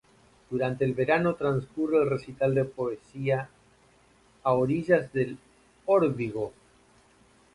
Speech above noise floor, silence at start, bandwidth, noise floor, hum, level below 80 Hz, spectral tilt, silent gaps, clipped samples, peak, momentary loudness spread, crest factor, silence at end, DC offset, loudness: 34 dB; 0.5 s; 11.5 kHz; -61 dBFS; none; -60 dBFS; -8.5 dB/octave; none; under 0.1%; -8 dBFS; 10 LU; 20 dB; 1.05 s; under 0.1%; -27 LUFS